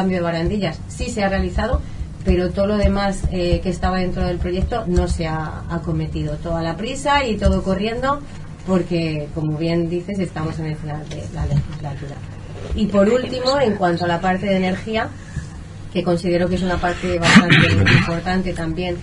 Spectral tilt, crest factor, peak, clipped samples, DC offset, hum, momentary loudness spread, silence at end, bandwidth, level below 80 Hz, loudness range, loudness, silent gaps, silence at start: -6 dB/octave; 20 dB; 0 dBFS; under 0.1%; under 0.1%; none; 13 LU; 0 s; 11 kHz; -30 dBFS; 7 LU; -20 LUFS; none; 0 s